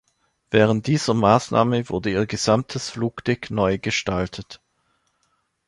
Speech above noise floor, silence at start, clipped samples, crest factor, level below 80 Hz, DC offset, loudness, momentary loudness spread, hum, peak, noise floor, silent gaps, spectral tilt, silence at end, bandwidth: 48 dB; 0.5 s; under 0.1%; 20 dB; -48 dBFS; under 0.1%; -21 LUFS; 9 LU; none; -2 dBFS; -69 dBFS; none; -5.5 dB/octave; 1.1 s; 11.5 kHz